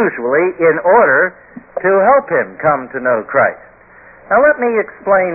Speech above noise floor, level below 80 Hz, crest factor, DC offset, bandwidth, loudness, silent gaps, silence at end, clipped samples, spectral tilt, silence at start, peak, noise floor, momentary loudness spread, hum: 29 dB; -52 dBFS; 12 dB; under 0.1%; 2.8 kHz; -13 LUFS; none; 0 s; under 0.1%; -13 dB/octave; 0 s; 0 dBFS; -42 dBFS; 7 LU; none